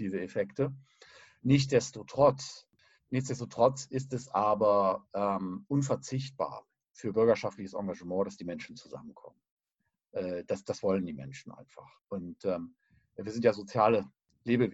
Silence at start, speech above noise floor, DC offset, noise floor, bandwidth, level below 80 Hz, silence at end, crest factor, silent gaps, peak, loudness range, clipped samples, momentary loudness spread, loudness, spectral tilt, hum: 0 s; 54 dB; under 0.1%; -84 dBFS; 8.2 kHz; -68 dBFS; 0 s; 20 dB; 9.51-9.57 s; -12 dBFS; 8 LU; under 0.1%; 19 LU; -31 LUFS; -6.5 dB/octave; none